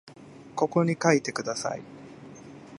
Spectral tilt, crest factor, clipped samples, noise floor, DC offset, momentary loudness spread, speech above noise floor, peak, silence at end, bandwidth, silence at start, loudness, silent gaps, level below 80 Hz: -5 dB/octave; 24 dB; under 0.1%; -46 dBFS; under 0.1%; 22 LU; 20 dB; -6 dBFS; 0 s; 11.5 kHz; 0.05 s; -26 LUFS; none; -70 dBFS